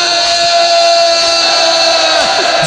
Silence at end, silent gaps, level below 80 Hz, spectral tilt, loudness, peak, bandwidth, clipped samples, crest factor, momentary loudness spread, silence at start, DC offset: 0 s; none; -48 dBFS; -0.5 dB/octave; -8 LUFS; 0 dBFS; 10.5 kHz; under 0.1%; 10 dB; 1 LU; 0 s; under 0.1%